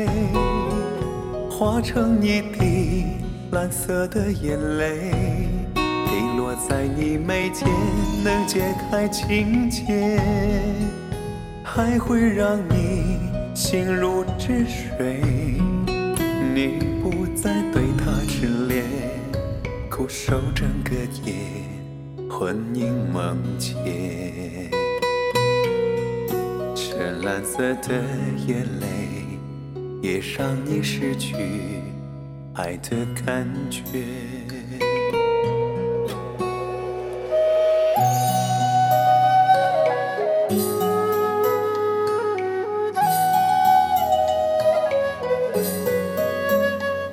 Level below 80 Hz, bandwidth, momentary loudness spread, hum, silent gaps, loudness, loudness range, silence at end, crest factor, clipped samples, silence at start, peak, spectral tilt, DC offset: -36 dBFS; 16.5 kHz; 10 LU; none; none; -23 LUFS; 7 LU; 0 s; 18 dB; under 0.1%; 0 s; -4 dBFS; -5.5 dB/octave; under 0.1%